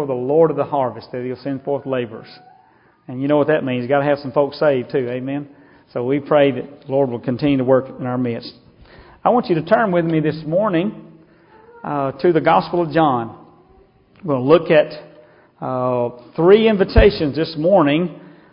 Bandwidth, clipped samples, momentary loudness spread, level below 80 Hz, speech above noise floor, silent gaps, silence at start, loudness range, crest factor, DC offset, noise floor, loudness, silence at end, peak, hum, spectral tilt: 5.4 kHz; under 0.1%; 13 LU; -34 dBFS; 36 dB; none; 0 s; 4 LU; 18 dB; under 0.1%; -53 dBFS; -18 LUFS; 0.25 s; 0 dBFS; none; -10.5 dB/octave